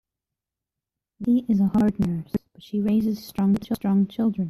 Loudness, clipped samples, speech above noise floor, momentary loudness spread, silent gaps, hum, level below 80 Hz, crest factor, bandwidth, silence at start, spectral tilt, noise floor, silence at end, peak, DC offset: -24 LUFS; under 0.1%; 65 dB; 10 LU; none; none; -52 dBFS; 12 dB; 13.5 kHz; 1.2 s; -8.5 dB/octave; -87 dBFS; 0 s; -12 dBFS; under 0.1%